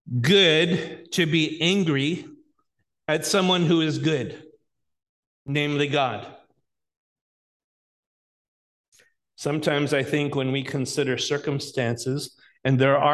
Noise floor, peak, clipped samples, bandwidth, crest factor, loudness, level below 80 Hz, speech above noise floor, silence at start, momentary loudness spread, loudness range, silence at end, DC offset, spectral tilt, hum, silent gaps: -75 dBFS; -6 dBFS; under 0.1%; 12.5 kHz; 20 dB; -23 LUFS; -64 dBFS; 52 dB; 0.05 s; 10 LU; 7 LU; 0 s; under 0.1%; -5 dB/octave; none; 5.09-5.45 s, 6.97-8.92 s